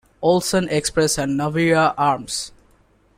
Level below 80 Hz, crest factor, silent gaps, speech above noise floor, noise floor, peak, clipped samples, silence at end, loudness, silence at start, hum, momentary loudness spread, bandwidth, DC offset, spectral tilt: -48 dBFS; 16 dB; none; 38 dB; -57 dBFS; -4 dBFS; under 0.1%; 0.7 s; -19 LUFS; 0.2 s; none; 9 LU; 16 kHz; under 0.1%; -4.5 dB/octave